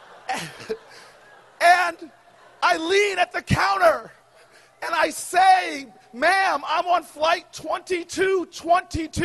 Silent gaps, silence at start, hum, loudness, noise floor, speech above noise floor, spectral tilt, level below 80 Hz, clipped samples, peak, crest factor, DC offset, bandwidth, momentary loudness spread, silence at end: none; 0.3 s; none; -21 LUFS; -53 dBFS; 31 dB; -3.5 dB/octave; -50 dBFS; under 0.1%; -4 dBFS; 20 dB; under 0.1%; 12 kHz; 14 LU; 0 s